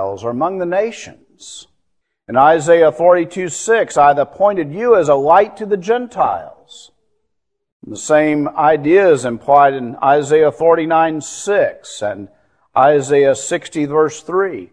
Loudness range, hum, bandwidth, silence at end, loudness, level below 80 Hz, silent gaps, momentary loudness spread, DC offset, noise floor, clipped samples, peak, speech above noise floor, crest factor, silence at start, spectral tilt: 4 LU; none; 11 kHz; 0.05 s; -14 LUFS; -56 dBFS; 7.72-7.80 s; 12 LU; under 0.1%; -73 dBFS; under 0.1%; 0 dBFS; 60 dB; 14 dB; 0 s; -5 dB/octave